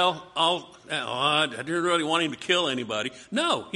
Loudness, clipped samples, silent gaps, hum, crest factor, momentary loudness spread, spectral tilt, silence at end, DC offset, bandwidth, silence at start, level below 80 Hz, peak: -25 LUFS; under 0.1%; none; none; 18 dB; 7 LU; -3 dB/octave; 0 s; under 0.1%; 11.5 kHz; 0 s; -68 dBFS; -8 dBFS